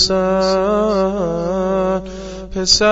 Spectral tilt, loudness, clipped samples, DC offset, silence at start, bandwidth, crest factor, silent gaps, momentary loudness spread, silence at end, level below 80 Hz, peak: -3.5 dB/octave; -17 LUFS; under 0.1%; under 0.1%; 0 s; 8 kHz; 16 dB; none; 11 LU; 0 s; -36 dBFS; 0 dBFS